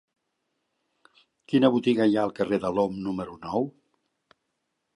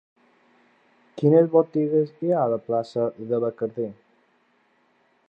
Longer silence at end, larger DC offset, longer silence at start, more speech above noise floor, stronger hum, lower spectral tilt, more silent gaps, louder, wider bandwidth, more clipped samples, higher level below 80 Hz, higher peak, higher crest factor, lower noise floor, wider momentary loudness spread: about the same, 1.25 s vs 1.35 s; neither; first, 1.5 s vs 1.15 s; first, 55 dB vs 43 dB; neither; second, -7.5 dB/octave vs -10 dB/octave; neither; about the same, -25 LUFS vs -23 LUFS; first, 11 kHz vs 5.6 kHz; neither; first, -64 dBFS vs -76 dBFS; about the same, -6 dBFS vs -6 dBFS; about the same, 20 dB vs 18 dB; first, -79 dBFS vs -65 dBFS; about the same, 10 LU vs 11 LU